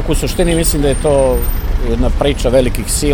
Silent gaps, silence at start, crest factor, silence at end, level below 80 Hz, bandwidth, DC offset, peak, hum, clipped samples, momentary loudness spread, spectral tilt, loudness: none; 0 s; 12 dB; 0 s; -16 dBFS; 19 kHz; under 0.1%; 0 dBFS; none; under 0.1%; 6 LU; -5 dB/octave; -14 LUFS